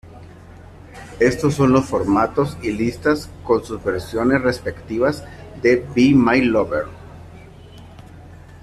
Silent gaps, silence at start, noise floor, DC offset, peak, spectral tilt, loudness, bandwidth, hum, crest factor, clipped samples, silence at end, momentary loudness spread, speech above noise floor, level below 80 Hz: none; 0.05 s; -41 dBFS; under 0.1%; -2 dBFS; -6.5 dB/octave; -19 LUFS; 13.5 kHz; none; 16 dB; under 0.1%; 0.05 s; 15 LU; 23 dB; -44 dBFS